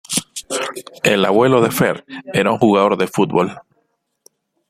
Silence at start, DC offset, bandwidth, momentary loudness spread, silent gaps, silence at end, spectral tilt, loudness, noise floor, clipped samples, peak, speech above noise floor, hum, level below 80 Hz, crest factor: 0.1 s; under 0.1%; 16 kHz; 10 LU; none; 1.1 s; -4.5 dB/octave; -16 LUFS; -67 dBFS; under 0.1%; 0 dBFS; 51 dB; none; -56 dBFS; 16 dB